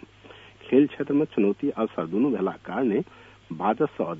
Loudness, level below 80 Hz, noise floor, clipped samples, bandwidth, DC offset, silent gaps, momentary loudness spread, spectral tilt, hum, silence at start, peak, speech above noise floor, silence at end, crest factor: -25 LUFS; -64 dBFS; -49 dBFS; under 0.1%; 3.9 kHz; under 0.1%; none; 7 LU; -9 dB/octave; none; 0.25 s; -6 dBFS; 25 dB; 0 s; 18 dB